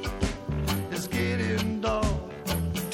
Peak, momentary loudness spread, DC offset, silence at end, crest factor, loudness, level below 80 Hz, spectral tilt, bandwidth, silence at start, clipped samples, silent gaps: -12 dBFS; 4 LU; under 0.1%; 0 s; 16 dB; -29 LUFS; -38 dBFS; -5.5 dB/octave; 17 kHz; 0 s; under 0.1%; none